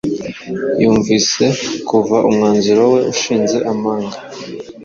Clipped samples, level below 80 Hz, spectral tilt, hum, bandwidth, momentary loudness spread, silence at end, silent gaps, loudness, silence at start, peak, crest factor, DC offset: under 0.1%; -50 dBFS; -4.5 dB/octave; none; 7.6 kHz; 13 LU; 0 s; none; -14 LUFS; 0.05 s; -2 dBFS; 14 dB; under 0.1%